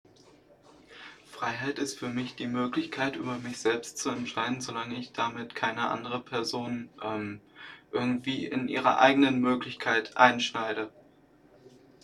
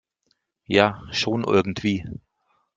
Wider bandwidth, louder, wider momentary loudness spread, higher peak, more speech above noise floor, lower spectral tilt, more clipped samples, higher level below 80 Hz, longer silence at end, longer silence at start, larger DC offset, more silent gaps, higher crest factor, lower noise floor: first, 13 kHz vs 7.8 kHz; second, -29 LUFS vs -22 LUFS; about the same, 14 LU vs 13 LU; second, -4 dBFS vs 0 dBFS; second, 30 dB vs 49 dB; second, -4 dB/octave vs -5.5 dB/octave; neither; second, -68 dBFS vs -54 dBFS; second, 0.35 s vs 0.6 s; first, 0.9 s vs 0.7 s; neither; neither; about the same, 28 dB vs 24 dB; second, -59 dBFS vs -71 dBFS